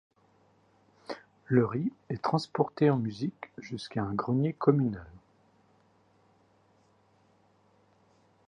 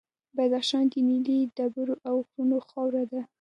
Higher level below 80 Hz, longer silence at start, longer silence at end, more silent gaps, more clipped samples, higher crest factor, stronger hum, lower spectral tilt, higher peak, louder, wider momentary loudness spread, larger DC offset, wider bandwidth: first, -64 dBFS vs -80 dBFS; first, 1.1 s vs 0.35 s; first, 3.3 s vs 0.15 s; neither; neither; first, 24 dB vs 12 dB; neither; first, -8 dB/octave vs -4.5 dB/octave; first, -8 dBFS vs -14 dBFS; second, -30 LUFS vs -27 LUFS; first, 18 LU vs 6 LU; neither; about the same, 10 kHz vs 11 kHz